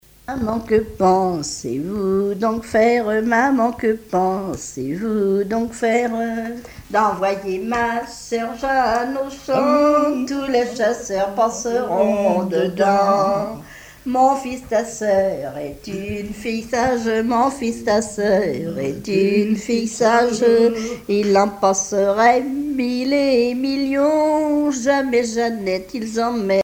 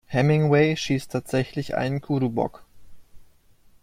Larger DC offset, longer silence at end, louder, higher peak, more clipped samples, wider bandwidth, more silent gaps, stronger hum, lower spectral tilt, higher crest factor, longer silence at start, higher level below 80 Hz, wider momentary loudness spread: neither; second, 0 s vs 0.6 s; first, -19 LUFS vs -24 LUFS; about the same, -4 dBFS vs -6 dBFS; neither; first, 17 kHz vs 14.5 kHz; neither; neither; second, -5 dB/octave vs -6.5 dB/octave; about the same, 16 dB vs 18 dB; first, 0.3 s vs 0.1 s; about the same, -48 dBFS vs -52 dBFS; about the same, 10 LU vs 9 LU